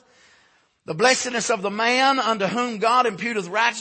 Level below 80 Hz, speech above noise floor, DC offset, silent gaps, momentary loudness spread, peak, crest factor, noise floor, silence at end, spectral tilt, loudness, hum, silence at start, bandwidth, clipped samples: -70 dBFS; 39 dB; under 0.1%; none; 6 LU; -4 dBFS; 18 dB; -60 dBFS; 0 s; -2.5 dB/octave; -20 LUFS; none; 0.9 s; 8.8 kHz; under 0.1%